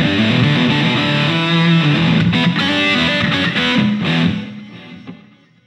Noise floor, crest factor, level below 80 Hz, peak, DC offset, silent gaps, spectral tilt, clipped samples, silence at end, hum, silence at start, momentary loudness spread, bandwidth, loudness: -46 dBFS; 14 dB; -46 dBFS; -2 dBFS; under 0.1%; none; -6 dB/octave; under 0.1%; 0.5 s; none; 0 s; 14 LU; 9.4 kHz; -14 LUFS